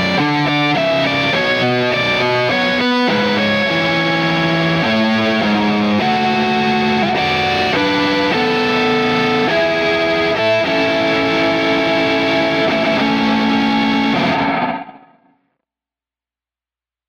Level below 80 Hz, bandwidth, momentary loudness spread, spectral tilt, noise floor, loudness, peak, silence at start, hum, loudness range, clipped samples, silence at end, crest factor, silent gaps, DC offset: -48 dBFS; 16 kHz; 1 LU; -5.5 dB/octave; under -90 dBFS; -15 LUFS; -4 dBFS; 0 s; none; 2 LU; under 0.1%; 2.1 s; 12 dB; none; under 0.1%